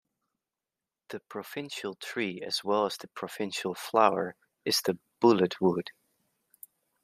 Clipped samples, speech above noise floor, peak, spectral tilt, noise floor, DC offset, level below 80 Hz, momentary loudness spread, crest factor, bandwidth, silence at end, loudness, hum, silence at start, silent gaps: under 0.1%; over 61 dB; -8 dBFS; -4.5 dB/octave; under -90 dBFS; under 0.1%; -78 dBFS; 15 LU; 24 dB; 15.5 kHz; 1.15 s; -29 LUFS; none; 1.1 s; none